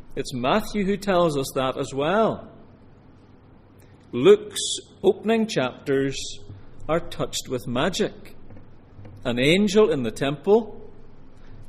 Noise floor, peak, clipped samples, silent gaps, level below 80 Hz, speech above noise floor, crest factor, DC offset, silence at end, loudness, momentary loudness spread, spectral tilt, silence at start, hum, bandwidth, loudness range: -50 dBFS; -4 dBFS; under 0.1%; none; -44 dBFS; 28 dB; 20 dB; under 0.1%; 0 s; -23 LUFS; 13 LU; -5 dB/octave; 0 s; none; 15 kHz; 4 LU